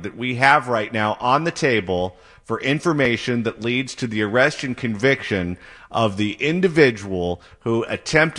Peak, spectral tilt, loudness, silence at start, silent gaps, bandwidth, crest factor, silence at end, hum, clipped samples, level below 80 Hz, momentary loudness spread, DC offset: -2 dBFS; -5.5 dB/octave; -20 LUFS; 0 s; none; 11.5 kHz; 20 dB; 0 s; none; under 0.1%; -52 dBFS; 10 LU; under 0.1%